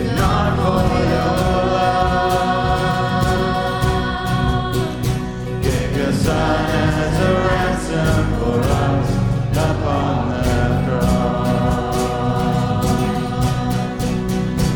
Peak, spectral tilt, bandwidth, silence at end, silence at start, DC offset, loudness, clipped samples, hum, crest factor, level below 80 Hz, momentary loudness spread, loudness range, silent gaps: -2 dBFS; -6.5 dB/octave; 19.5 kHz; 0 s; 0 s; under 0.1%; -18 LUFS; under 0.1%; none; 14 dB; -28 dBFS; 4 LU; 2 LU; none